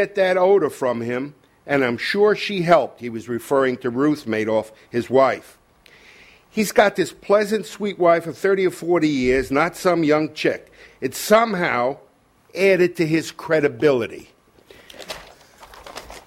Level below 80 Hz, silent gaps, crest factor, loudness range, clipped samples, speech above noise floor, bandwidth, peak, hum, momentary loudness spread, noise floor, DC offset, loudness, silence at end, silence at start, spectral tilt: -52 dBFS; none; 18 dB; 3 LU; under 0.1%; 36 dB; 16 kHz; -2 dBFS; none; 14 LU; -55 dBFS; under 0.1%; -20 LUFS; 0.1 s; 0 s; -5 dB/octave